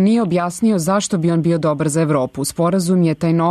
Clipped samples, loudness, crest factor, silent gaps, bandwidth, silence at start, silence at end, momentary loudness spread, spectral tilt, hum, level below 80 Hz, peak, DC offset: under 0.1%; -17 LUFS; 10 dB; none; 13.5 kHz; 0 s; 0 s; 3 LU; -6.5 dB/octave; none; -52 dBFS; -6 dBFS; under 0.1%